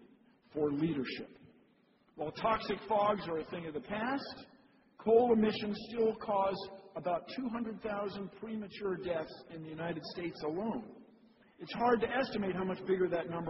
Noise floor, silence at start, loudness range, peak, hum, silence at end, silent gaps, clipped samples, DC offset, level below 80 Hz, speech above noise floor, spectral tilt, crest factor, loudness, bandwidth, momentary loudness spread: -69 dBFS; 0 s; 7 LU; -14 dBFS; none; 0 s; none; under 0.1%; under 0.1%; -66 dBFS; 34 dB; -4.5 dB/octave; 20 dB; -35 LUFS; 5.8 kHz; 14 LU